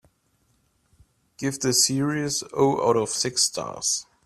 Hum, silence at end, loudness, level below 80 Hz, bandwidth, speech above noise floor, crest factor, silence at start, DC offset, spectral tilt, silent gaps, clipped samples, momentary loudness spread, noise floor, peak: none; 0.2 s; -23 LUFS; -62 dBFS; 14 kHz; 44 dB; 20 dB; 1.4 s; under 0.1%; -3 dB/octave; none; under 0.1%; 7 LU; -67 dBFS; -6 dBFS